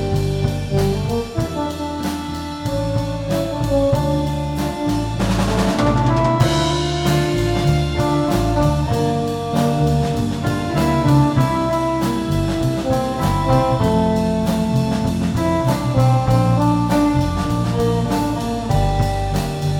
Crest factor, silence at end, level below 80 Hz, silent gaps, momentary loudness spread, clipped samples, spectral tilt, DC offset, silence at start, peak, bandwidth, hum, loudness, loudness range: 14 dB; 0 s; -30 dBFS; none; 6 LU; under 0.1%; -6.5 dB/octave; under 0.1%; 0 s; -4 dBFS; 17.5 kHz; none; -18 LUFS; 4 LU